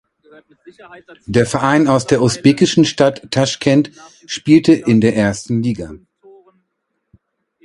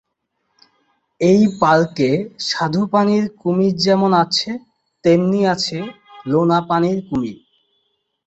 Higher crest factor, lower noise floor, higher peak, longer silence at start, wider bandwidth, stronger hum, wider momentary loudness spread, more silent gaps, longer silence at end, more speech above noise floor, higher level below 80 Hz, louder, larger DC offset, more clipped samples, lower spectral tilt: about the same, 16 dB vs 16 dB; about the same, -72 dBFS vs -72 dBFS; about the same, 0 dBFS vs -2 dBFS; second, 0.65 s vs 1.2 s; first, 11.5 kHz vs 8.2 kHz; neither; about the same, 12 LU vs 10 LU; neither; first, 1.65 s vs 0.9 s; about the same, 57 dB vs 55 dB; first, -48 dBFS vs -56 dBFS; first, -14 LUFS vs -17 LUFS; neither; neither; about the same, -5.5 dB/octave vs -6 dB/octave